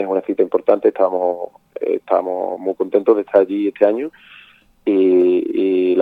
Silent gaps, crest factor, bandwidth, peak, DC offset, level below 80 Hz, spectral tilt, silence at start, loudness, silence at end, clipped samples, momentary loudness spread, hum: none; 16 dB; 4.4 kHz; 0 dBFS; under 0.1%; -66 dBFS; -8.5 dB/octave; 0 s; -17 LUFS; 0 s; under 0.1%; 10 LU; none